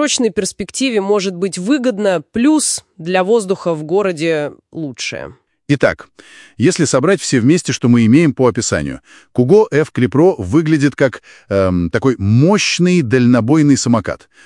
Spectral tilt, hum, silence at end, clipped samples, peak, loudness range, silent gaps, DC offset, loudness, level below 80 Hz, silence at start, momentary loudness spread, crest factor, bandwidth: -5.5 dB/octave; none; 0.3 s; under 0.1%; 0 dBFS; 5 LU; none; under 0.1%; -14 LUFS; -50 dBFS; 0 s; 11 LU; 14 dB; 12 kHz